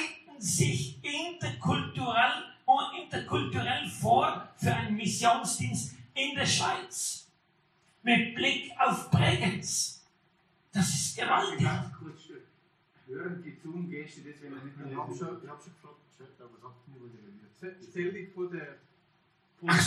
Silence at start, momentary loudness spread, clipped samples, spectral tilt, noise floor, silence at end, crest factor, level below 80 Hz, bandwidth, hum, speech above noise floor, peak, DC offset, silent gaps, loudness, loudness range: 0 s; 19 LU; under 0.1%; -3.5 dB/octave; -69 dBFS; 0 s; 22 dB; -66 dBFS; 13 kHz; none; 37 dB; -10 dBFS; under 0.1%; none; -30 LUFS; 14 LU